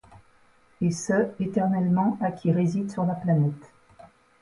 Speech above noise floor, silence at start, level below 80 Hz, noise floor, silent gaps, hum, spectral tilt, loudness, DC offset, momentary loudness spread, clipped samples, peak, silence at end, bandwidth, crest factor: 35 dB; 0.1 s; -62 dBFS; -59 dBFS; none; none; -7.5 dB/octave; -25 LUFS; under 0.1%; 5 LU; under 0.1%; -12 dBFS; 0.35 s; 11.5 kHz; 14 dB